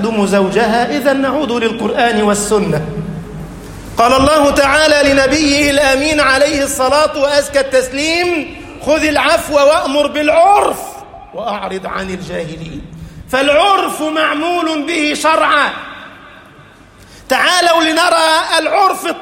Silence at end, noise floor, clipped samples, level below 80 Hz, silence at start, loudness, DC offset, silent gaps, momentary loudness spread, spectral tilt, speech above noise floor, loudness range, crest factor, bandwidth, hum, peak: 0 s; -40 dBFS; under 0.1%; -38 dBFS; 0 s; -12 LUFS; under 0.1%; none; 15 LU; -3.5 dB/octave; 28 dB; 5 LU; 14 dB; 16.5 kHz; none; 0 dBFS